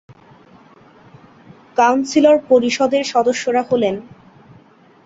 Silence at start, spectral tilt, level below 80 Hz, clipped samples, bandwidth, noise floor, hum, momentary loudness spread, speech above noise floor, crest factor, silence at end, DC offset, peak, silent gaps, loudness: 1.75 s; -4 dB/octave; -62 dBFS; under 0.1%; 8 kHz; -48 dBFS; none; 7 LU; 33 dB; 16 dB; 1.05 s; under 0.1%; -2 dBFS; none; -16 LUFS